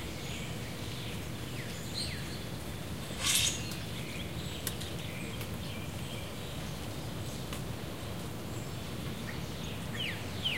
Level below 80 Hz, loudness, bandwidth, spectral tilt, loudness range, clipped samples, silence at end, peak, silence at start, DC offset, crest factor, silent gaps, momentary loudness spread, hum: -50 dBFS; -37 LUFS; 16 kHz; -3 dB/octave; 6 LU; under 0.1%; 0 s; -14 dBFS; 0 s; 0.4%; 24 dB; none; 7 LU; none